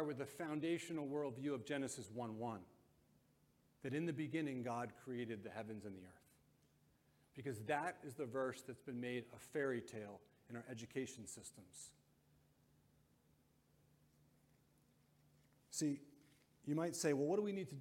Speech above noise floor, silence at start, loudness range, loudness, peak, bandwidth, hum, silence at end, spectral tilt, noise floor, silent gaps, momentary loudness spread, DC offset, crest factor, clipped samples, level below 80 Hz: 31 dB; 0 s; 9 LU; -45 LUFS; -26 dBFS; 16.5 kHz; none; 0 s; -5 dB/octave; -76 dBFS; none; 14 LU; under 0.1%; 20 dB; under 0.1%; -84 dBFS